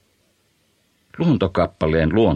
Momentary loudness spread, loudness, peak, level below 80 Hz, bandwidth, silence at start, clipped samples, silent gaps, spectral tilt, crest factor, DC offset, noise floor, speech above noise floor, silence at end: 3 LU; -19 LUFS; -4 dBFS; -38 dBFS; 8 kHz; 1.15 s; under 0.1%; none; -9 dB/octave; 16 dB; under 0.1%; -63 dBFS; 46 dB; 0 s